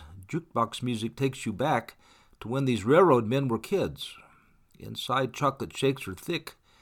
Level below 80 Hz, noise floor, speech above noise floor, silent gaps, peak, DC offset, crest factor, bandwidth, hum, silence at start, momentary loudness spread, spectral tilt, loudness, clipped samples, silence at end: -60 dBFS; -60 dBFS; 32 dB; none; -10 dBFS; under 0.1%; 20 dB; 18 kHz; none; 0 s; 18 LU; -6 dB/octave; -28 LUFS; under 0.1%; 0.3 s